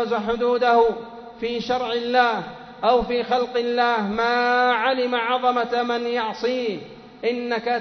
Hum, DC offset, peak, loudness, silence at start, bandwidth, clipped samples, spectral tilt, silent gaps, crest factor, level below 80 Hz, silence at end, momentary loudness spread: none; under 0.1%; -4 dBFS; -22 LUFS; 0 s; 6.4 kHz; under 0.1%; -5 dB/octave; none; 16 dB; -52 dBFS; 0 s; 10 LU